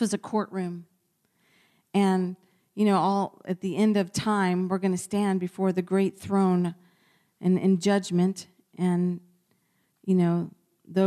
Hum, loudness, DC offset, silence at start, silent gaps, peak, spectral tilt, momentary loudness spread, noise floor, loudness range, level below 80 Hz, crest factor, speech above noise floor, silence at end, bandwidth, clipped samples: none; -26 LUFS; under 0.1%; 0 s; none; -12 dBFS; -6.5 dB/octave; 11 LU; -71 dBFS; 3 LU; -68 dBFS; 14 dB; 46 dB; 0 s; 13 kHz; under 0.1%